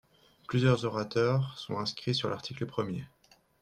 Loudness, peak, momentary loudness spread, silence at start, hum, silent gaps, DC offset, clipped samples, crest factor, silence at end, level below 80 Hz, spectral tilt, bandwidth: -31 LUFS; -14 dBFS; 10 LU; 0.5 s; none; none; under 0.1%; under 0.1%; 18 dB; 0.55 s; -64 dBFS; -6.5 dB/octave; 9.8 kHz